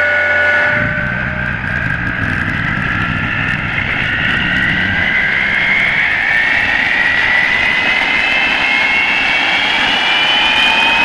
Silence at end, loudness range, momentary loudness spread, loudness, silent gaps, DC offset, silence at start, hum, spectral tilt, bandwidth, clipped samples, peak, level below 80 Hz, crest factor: 0 s; 5 LU; 6 LU; -12 LUFS; none; under 0.1%; 0 s; none; -4 dB/octave; 12 kHz; under 0.1%; 0 dBFS; -34 dBFS; 14 dB